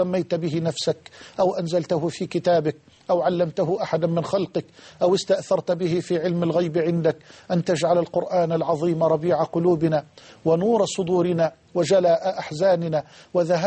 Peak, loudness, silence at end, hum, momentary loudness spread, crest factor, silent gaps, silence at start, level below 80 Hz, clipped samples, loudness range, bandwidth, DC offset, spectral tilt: -8 dBFS; -23 LUFS; 0 s; none; 7 LU; 14 dB; none; 0 s; -62 dBFS; under 0.1%; 2 LU; 8.8 kHz; under 0.1%; -6.5 dB/octave